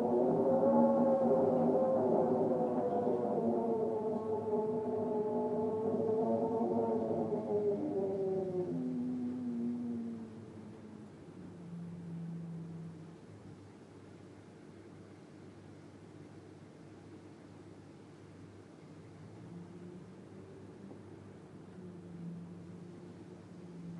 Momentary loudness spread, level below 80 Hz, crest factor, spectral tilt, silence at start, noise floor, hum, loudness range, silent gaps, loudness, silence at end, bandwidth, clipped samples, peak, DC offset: 24 LU; -76 dBFS; 20 dB; -9.5 dB/octave; 0 s; -54 dBFS; none; 22 LU; none; -34 LUFS; 0 s; 11 kHz; under 0.1%; -16 dBFS; under 0.1%